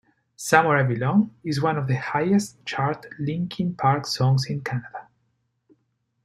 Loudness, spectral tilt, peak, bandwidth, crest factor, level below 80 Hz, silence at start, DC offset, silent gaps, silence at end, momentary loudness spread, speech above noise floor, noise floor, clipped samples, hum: -23 LUFS; -6 dB/octave; -2 dBFS; 13 kHz; 22 dB; -62 dBFS; 0.4 s; under 0.1%; none; 1.2 s; 11 LU; 49 dB; -72 dBFS; under 0.1%; none